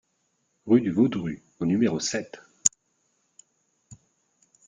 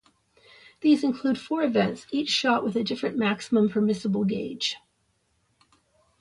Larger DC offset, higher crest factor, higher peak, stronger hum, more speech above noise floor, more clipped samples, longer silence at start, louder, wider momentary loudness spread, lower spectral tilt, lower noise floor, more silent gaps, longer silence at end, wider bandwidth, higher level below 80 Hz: neither; first, 28 dB vs 18 dB; first, 0 dBFS vs -10 dBFS; neither; about the same, 49 dB vs 46 dB; neither; second, 0.65 s vs 0.8 s; about the same, -25 LUFS vs -25 LUFS; first, 12 LU vs 6 LU; about the same, -4.5 dB/octave vs -5 dB/octave; about the same, -73 dBFS vs -71 dBFS; neither; second, 0.75 s vs 1.45 s; second, 9.6 kHz vs 11.5 kHz; about the same, -66 dBFS vs -66 dBFS